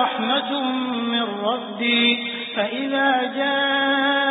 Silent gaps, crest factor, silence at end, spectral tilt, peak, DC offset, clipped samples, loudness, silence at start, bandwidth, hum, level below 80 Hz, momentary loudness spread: none; 14 dB; 0 s; -8.5 dB/octave; -6 dBFS; under 0.1%; under 0.1%; -21 LUFS; 0 s; 4 kHz; none; -74 dBFS; 7 LU